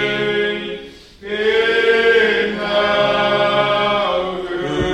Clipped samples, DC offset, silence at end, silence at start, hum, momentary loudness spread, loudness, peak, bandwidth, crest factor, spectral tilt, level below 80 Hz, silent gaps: under 0.1%; under 0.1%; 0 s; 0 s; none; 11 LU; -16 LUFS; -2 dBFS; 10.5 kHz; 14 dB; -5 dB/octave; -42 dBFS; none